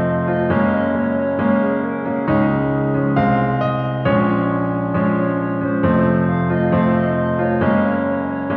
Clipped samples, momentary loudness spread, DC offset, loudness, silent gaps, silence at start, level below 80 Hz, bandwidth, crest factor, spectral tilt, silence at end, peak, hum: under 0.1%; 4 LU; under 0.1%; -18 LUFS; none; 0 s; -44 dBFS; 4.6 kHz; 14 dB; -11 dB/octave; 0 s; -4 dBFS; none